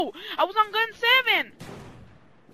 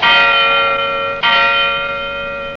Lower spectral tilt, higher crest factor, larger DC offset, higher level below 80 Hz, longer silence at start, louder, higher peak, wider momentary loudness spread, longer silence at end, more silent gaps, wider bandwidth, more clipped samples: about the same, -3 dB/octave vs -3 dB/octave; first, 20 dB vs 12 dB; first, 0.1% vs under 0.1%; second, -62 dBFS vs -42 dBFS; about the same, 0 s vs 0 s; second, -22 LUFS vs -12 LUFS; second, -6 dBFS vs -2 dBFS; first, 19 LU vs 11 LU; first, 0.55 s vs 0 s; neither; first, 15.5 kHz vs 7.6 kHz; neither